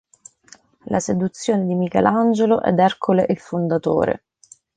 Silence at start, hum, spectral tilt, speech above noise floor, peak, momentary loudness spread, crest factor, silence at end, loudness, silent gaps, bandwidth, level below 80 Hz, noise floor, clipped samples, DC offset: 0.85 s; none; -6.5 dB/octave; 33 dB; -2 dBFS; 6 LU; 18 dB; 0.6 s; -19 LUFS; none; 9.4 kHz; -54 dBFS; -51 dBFS; under 0.1%; under 0.1%